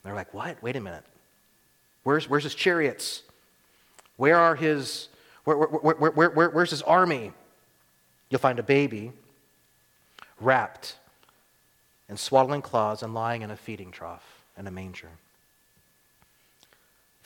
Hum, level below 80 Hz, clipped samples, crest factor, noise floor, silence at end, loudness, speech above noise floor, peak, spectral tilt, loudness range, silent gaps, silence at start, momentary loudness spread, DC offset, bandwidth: none; -70 dBFS; under 0.1%; 22 dB; -65 dBFS; 2.15 s; -25 LUFS; 40 dB; -6 dBFS; -5 dB/octave; 11 LU; none; 0.05 s; 20 LU; under 0.1%; 19 kHz